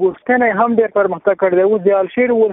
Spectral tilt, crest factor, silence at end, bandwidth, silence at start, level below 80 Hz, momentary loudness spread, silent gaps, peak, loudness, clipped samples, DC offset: -11.5 dB/octave; 12 dB; 0 s; 3.9 kHz; 0 s; -56 dBFS; 3 LU; none; 0 dBFS; -14 LUFS; under 0.1%; under 0.1%